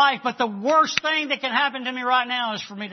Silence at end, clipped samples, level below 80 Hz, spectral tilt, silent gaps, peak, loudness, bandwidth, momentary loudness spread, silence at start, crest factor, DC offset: 0 s; under 0.1%; -72 dBFS; -2.5 dB/octave; none; 0 dBFS; -22 LUFS; 6.4 kHz; 7 LU; 0 s; 22 dB; under 0.1%